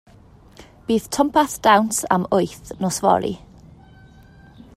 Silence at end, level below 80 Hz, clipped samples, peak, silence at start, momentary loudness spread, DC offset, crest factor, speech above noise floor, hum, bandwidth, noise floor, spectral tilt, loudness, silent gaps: 1.4 s; -50 dBFS; under 0.1%; -2 dBFS; 0.6 s; 12 LU; under 0.1%; 20 dB; 29 dB; none; 16 kHz; -48 dBFS; -4 dB/octave; -19 LUFS; none